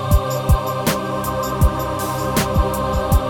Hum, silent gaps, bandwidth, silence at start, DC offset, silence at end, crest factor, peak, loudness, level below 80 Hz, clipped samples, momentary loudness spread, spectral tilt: none; none; 18 kHz; 0 s; under 0.1%; 0 s; 16 dB; -2 dBFS; -20 LUFS; -22 dBFS; under 0.1%; 4 LU; -5.5 dB/octave